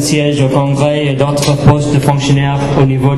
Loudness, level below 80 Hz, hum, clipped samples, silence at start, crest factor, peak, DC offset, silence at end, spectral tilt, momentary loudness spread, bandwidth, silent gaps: -11 LUFS; -32 dBFS; none; under 0.1%; 0 s; 10 dB; 0 dBFS; under 0.1%; 0 s; -6 dB/octave; 3 LU; 13.5 kHz; none